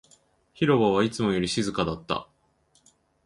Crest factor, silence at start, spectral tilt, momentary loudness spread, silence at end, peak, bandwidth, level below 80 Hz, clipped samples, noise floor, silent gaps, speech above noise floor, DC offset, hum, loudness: 20 dB; 0.6 s; -5.5 dB/octave; 10 LU; 1 s; -8 dBFS; 11.5 kHz; -54 dBFS; under 0.1%; -66 dBFS; none; 42 dB; under 0.1%; none; -25 LUFS